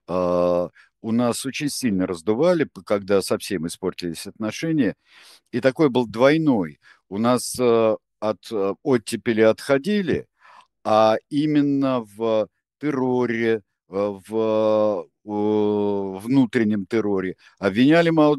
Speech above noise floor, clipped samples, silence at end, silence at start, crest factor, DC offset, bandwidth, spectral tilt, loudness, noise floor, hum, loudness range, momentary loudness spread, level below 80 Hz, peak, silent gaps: 31 dB; under 0.1%; 0 s; 0.1 s; 20 dB; under 0.1%; 12.5 kHz; -6 dB/octave; -22 LUFS; -52 dBFS; none; 3 LU; 10 LU; -62 dBFS; -2 dBFS; none